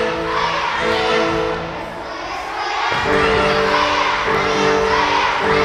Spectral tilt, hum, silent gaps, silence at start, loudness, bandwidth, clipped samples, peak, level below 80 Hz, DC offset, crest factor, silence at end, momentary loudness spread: -4 dB/octave; none; none; 0 s; -17 LUFS; 13 kHz; under 0.1%; -4 dBFS; -38 dBFS; under 0.1%; 14 dB; 0 s; 10 LU